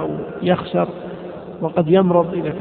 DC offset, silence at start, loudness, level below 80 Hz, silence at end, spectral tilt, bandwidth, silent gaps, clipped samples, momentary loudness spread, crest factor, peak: under 0.1%; 0 s; -19 LUFS; -52 dBFS; 0 s; -12.5 dB/octave; 4.4 kHz; none; under 0.1%; 17 LU; 18 dB; -2 dBFS